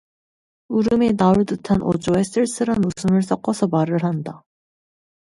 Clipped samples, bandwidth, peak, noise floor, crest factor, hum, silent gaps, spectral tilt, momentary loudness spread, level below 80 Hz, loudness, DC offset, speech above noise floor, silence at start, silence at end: under 0.1%; 11.5 kHz; -2 dBFS; under -90 dBFS; 18 dB; none; none; -7 dB/octave; 6 LU; -48 dBFS; -20 LUFS; under 0.1%; over 71 dB; 0.7 s; 0.85 s